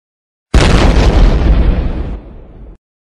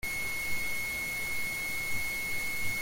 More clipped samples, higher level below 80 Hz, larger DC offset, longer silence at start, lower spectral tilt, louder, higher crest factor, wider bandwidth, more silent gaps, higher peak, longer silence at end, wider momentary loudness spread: neither; first, -12 dBFS vs -50 dBFS; neither; first, 0.55 s vs 0.05 s; first, -6 dB/octave vs -1.5 dB/octave; first, -12 LUFS vs -32 LUFS; about the same, 10 dB vs 14 dB; second, 10.5 kHz vs 17 kHz; neither; first, 0 dBFS vs -18 dBFS; first, 0.35 s vs 0 s; first, 14 LU vs 0 LU